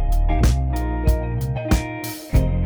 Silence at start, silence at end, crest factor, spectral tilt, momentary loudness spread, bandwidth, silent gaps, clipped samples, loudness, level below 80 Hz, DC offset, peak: 0 s; 0 s; 14 dB; -6.5 dB/octave; 5 LU; over 20 kHz; none; under 0.1%; -22 LUFS; -22 dBFS; under 0.1%; -6 dBFS